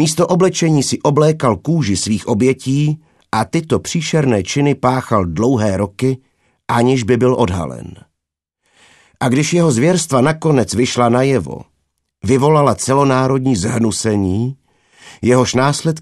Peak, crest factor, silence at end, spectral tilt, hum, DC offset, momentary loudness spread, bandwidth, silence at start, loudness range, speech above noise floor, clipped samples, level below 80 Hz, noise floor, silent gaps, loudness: 0 dBFS; 16 dB; 0 s; -5.5 dB/octave; none; under 0.1%; 8 LU; 13 kHz; 0 s; 2 LU; 65 dB; under 0.1%; -46 dBFS; -79 dBFS; none; -15 LUFS